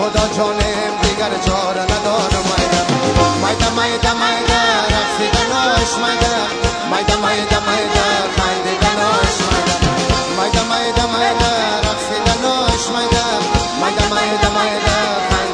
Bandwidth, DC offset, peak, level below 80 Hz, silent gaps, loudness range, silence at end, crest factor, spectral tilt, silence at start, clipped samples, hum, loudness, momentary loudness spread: 10.5 kHz; under 0.1%; 0 dBFS; -26 dBFS; none; 1 LU; 0 s; 16 dB; -3.5 dB/octave; 0 s; under 0.1%; none; -15 LUFS; 3 LU